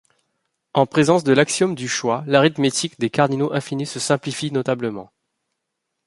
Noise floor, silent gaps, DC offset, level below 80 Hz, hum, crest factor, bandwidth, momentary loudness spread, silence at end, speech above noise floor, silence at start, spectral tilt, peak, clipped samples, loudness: -78 dBFS; none; under 0.1%; -62 dBFS; none; 20 dB; 11.5 kHz; 8 LU; 1.05 s; 59 dB; 0.75 s; -4.5 dB/octave; -2 dBFS; under 0.1%; -20 LUFS